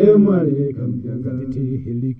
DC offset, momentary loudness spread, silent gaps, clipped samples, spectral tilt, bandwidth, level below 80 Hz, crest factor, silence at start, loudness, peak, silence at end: under 0.1%; 12 LU; none; under 0.1%; -12.5 dB/octave; 3.7 kHz; -46 dBFS; 16 dB; 0 s; -19 LUFS; -2 dBFS; 0 s